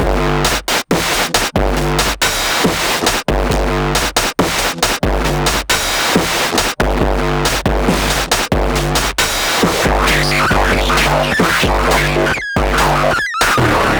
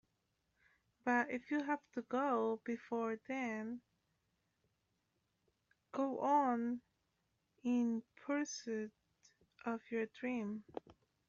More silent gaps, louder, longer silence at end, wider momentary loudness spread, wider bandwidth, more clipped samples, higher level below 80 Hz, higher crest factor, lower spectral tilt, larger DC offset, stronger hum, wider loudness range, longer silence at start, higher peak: neither; first, -14 LUFS vs -40 LUFS; second, 0 s vs 0.65 s; second, 3 LU vs 12 LU; first, over 20 kHz vs 7.4 kHz; neither; first, -22 dBFS vs -84 dBFS; second, 14 dB vs 20 dB; about the same, -3.5 dB/octave vs -4 dB/octave; neither; neither; second, 2 LU vs 6 LU; second, 0 s vs 1.05 s; first, 0 dBFS vs -22 dBFS